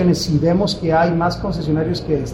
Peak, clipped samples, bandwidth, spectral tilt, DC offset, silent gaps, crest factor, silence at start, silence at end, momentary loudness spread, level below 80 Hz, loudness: -4 dBFS; under 0.1%; 15 kHz; -6.5 dB/octave; under 0.1%; none; 12 dB; 0 s; 0 s; 4 LU; -36 dBFS; -18 LUFS